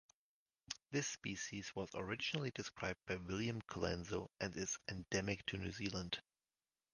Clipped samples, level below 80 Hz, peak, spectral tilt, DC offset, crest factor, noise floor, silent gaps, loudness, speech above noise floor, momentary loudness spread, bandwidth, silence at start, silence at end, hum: under 0.1%; -64 dBFS; -22 dBFS; -4 dB/octave; under 0.1%; 22 dB; under -90 dBFS; none; -44 LUFS; over 46 dB; 5 LU; 10.5 kHz; 0.7 s; 0.75 s; none